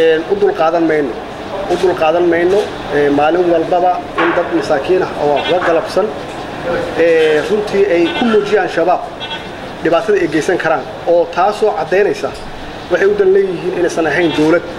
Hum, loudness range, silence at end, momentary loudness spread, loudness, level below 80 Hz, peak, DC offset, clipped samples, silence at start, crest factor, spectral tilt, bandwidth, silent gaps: none; 1 LU; 0 s; 10 LU; -14 LUFS; -42 dBFS; 0 dBFS; under 0.1%; under 0.1%; 0 s; 12 dB; -5.5 dB/octave; 13 kHz; none